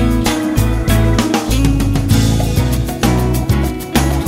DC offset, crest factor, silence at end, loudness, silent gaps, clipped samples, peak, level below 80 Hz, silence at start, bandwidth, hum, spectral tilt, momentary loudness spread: under 0.1%; 14 dB; 0 s; -15 LUFS; none; under 0.1%; 0 dBFS; -20 dBFS; 0 s; 16.5 kHz; none; -5.5 dB/octave; 3 LU